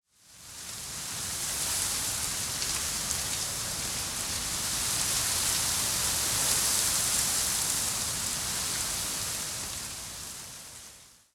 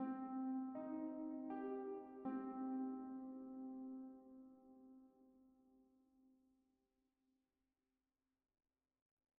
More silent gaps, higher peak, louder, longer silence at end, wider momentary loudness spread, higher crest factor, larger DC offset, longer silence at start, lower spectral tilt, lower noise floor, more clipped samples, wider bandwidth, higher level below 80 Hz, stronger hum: neither; first, -10 dBFS vs -36 dBFS; first, -28 LUFS vs -49 LUFS; second, 0.25 s vs 3.1 s; second, 13 LU vs 19 LU; about the same, 20 dB vs 16 dB; neither; first, 0.3 s vs 0 s; second, -0.5 dB/octave vs -3.5 dB/octave; second, -52 dBFS vs under -90 dBFS; neither; first, 17.5 kHz vs 2.9 kHz; first, -50 dBFS vs -90 dBFS; neither